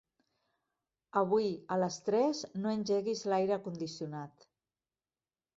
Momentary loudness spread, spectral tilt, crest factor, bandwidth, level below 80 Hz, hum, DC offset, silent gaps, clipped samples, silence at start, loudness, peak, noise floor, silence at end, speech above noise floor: 11 LU; -5.5 dB/octave; 20 dB; 7.8 kHz; -76 dBFS; none; under 0.1%; none; under 0.1%; 1.15 s; -34 LUFS; -16 dBFS; under -90 dBFS; 1.3 s; over 57 dB